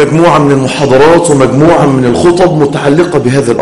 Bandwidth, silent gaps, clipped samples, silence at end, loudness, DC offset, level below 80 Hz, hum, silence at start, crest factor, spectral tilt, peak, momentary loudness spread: 11.5 kHz; none; 3%; 0 s; -7 LUFS; under 0.1%; -34 dBFS; none; 0 s; 6 dB; -6 dB/octave; 0 dBFS; 4 LU